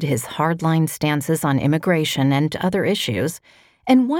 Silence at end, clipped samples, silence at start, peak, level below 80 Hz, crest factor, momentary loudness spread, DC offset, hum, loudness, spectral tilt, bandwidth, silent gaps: 0 s; under 0.1%; 0 s; -4 dBFS; -54 dBFS; 16 dB; 5 LU; under 0.1%; none; -20 LUFS; -5.5 dB/octave; 19 kHz; none